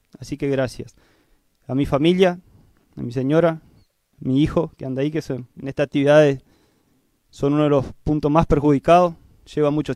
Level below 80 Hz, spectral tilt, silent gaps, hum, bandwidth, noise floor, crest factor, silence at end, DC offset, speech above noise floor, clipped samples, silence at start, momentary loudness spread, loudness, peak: -42 dBFS; -7.5 dB/octave; none; none; 12.5 kHz; -63 dBFS; 18 dB; 0 s; under 0.1%; 45 dB; under 0.1%; 0.2 s; 16 LU; -20 LUFS; -2 dBFS